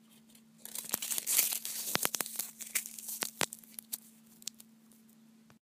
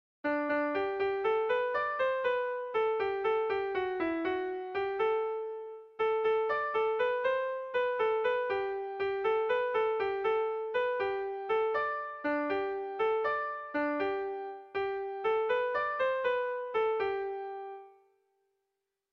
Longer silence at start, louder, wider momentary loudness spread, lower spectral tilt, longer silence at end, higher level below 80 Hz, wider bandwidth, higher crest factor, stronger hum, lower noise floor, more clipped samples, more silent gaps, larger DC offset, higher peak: second, 0.1 s vs 0.25 s; about the same, -34 LUFS vs -32 LUFS; first, 17 LU vs 6 LU; second, 0 dB/octave vs -5.5 dB/octave; second, 0.2 s vs 1.2 s; second, -80 dBFS vs -70 dBFS; first, 16 kHz vs 6 kHz; first, 34 dB vs 12 dB; neither; second, -61 dBFS vs -85 dBFS; neither; neither; neither; first, -4 dBFS vs -20 dBFS